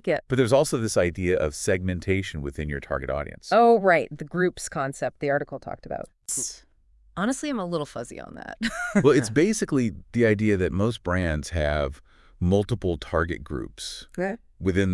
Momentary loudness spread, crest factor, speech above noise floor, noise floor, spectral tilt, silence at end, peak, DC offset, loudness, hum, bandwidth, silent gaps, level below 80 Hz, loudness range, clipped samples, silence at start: 14 LU; 20 dB; 33 dB; -58 dBFS; -5.5 dB/octave; 0 s; -6 dBFS; under 0.1%; -25 LUFS; none; 12 kHz; none; -44 dBFS; 6 LU; under 0.1%; 0.05 s